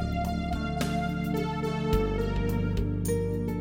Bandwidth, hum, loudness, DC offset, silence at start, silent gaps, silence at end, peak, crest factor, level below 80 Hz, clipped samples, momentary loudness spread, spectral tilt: 16.5 kHz; none; -29 LUFS; under 0.1%; 0 s; none; 0 s; -12 dBFS; 16 dB; -36 dBFS; under 0.1%; 3 LU; -7 dB/octave